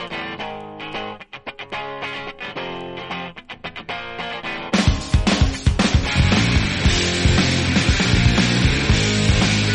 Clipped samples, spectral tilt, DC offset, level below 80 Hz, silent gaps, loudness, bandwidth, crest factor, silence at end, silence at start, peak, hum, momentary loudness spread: under 0.1%; -4.5 dB/octave; under 0.1%; -26 dBFS; none; -19 LUFS; 10.5 kHz; 16 dB; 0 s; 0 s; -4 dBFS; none; 14 LU